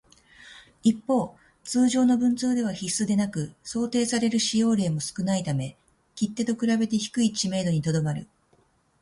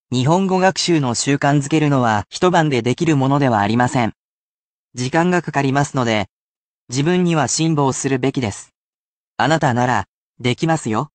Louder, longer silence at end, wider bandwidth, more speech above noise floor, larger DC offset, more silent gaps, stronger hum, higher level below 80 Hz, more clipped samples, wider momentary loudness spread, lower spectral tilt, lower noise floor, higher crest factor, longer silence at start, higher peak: second, -25 LUFS vs -17 LUFS; first, 0.8 s vs 0.1 s; first, 11.5 kHz vs 9.6 kHz; second, 40 dB vs over 73 dB; neither; second, none vs 4.16-4.91 s, 6.29-6.87 s, 8.75-9.35 s, 10.08-10.35 s; neither; second, -60 dBFS vs -54 dBFS; neither; about the same, 9 LU vs 8 LU; about the same, -5 dB/octave vs -5 dB/octave; second, -64 dBFS vs under -90 dBFS; about the same, 16 dB vs 16 dB; first, 0.45 s vs 0.1 s; second, -10 dBFS vs -2 dBFS